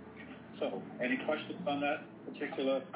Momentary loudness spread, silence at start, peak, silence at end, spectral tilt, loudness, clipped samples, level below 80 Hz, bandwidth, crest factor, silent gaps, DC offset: 14 LU; 0 s; -22 dBFS; 0 s; -3.5 dB/octave; -37 LUFS; under 0.1%; -74 dBFS; 4 kHz; 16 dB; none; under 0.1%